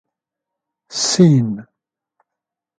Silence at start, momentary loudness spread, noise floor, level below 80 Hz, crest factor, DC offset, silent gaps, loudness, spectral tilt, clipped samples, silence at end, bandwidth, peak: 0.9 s; 16 LU; -84 dBFS; -62 dBFS; 20 dB; under 0.1%; none; -15 LUFS; -5.5 dB/octave; under 0.1%; 1.2 s; 9.4 kHz; 0 dBFS